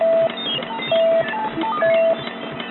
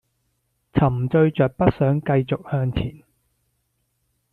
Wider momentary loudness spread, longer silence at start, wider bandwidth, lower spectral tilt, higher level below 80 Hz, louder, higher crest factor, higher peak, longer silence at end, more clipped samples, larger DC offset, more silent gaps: about the same, 7 LU vs 7 LU; second, 0 s vs 0.75 s; about the same, 4.2 kHz vs 4.5 kHz; about the same, -9 dB/octave vs -10 dB/octave; second, -60 dBFS vs -44 dBFS; about the same, -20 LUFS vs -21 LUFS; second, 10 dB vs 20 dB; second, -8 dBFS vs -2 dBFS; second, 0 s vs 1.4 s; neither; neither; neither